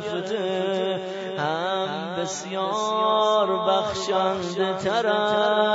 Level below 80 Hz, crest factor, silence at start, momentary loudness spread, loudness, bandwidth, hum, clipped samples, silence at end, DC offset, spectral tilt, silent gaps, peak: -64 dBFS; 14 dB; 0 s; 8 LU; -24 LUFS; 8 kHz; none; under 0.1%; 0 s; under 0.1%; -4 dB/octave; none; -10 dBFS